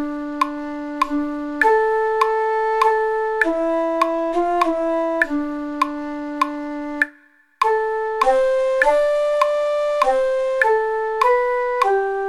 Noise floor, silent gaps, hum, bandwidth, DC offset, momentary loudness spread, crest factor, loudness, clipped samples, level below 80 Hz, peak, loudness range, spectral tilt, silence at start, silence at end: -53 dBFS; none; none; 13.5 kHz; under 0.1%; 7 LU; 18 dB; -19 LUFS; under 0.1%; -48 dBFS; 0 dBFS; 4 LU; -3 dB/octave; 0 s; 0 s